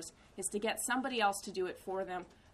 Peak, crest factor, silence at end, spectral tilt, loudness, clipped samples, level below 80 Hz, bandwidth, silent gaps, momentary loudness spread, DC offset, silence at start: -20 dBFS; 18 dB; 0.2 s; -2.5 dB/octave; -36 LUFS; under 0.1%; -68 dBFS; 15 kHz; none; 9 LU; under 0.1%; 0 s